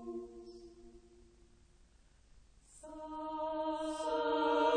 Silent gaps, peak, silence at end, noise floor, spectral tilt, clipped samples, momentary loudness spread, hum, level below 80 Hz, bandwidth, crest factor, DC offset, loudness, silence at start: none; -22 dBFS; 0 s; -65 dBFS; -4 dB/octave; under 0.1%; 24 LU; none; -64 dBFS; 9.8 kHz; 18 dB; under 0.1%; -37 LUFS; 0 s